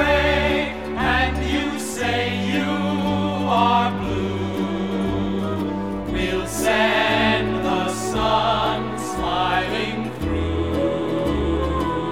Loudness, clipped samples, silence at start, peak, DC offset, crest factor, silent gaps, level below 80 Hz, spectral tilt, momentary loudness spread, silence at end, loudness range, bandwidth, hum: -21 LUFS; under 0.1%; 0 s; -6 dBFS; 0.6%; 16 dB; none; -34 dBFS; -5 dB/octave; 7 LU; 0 s; 2 LU; 17.5 kHz; none